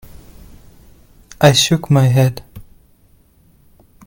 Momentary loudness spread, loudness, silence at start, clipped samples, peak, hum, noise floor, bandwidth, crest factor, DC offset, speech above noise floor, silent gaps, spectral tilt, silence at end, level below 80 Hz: 7 LU; -13 LUFS; 1.4 s; under 0.1%; 0 dBFS; none; -52 dBFS; 17 kHz; 18 dB; under 0.1%; 39 dB; none; -5 dB/octave; 1.45 s; -44 dBFS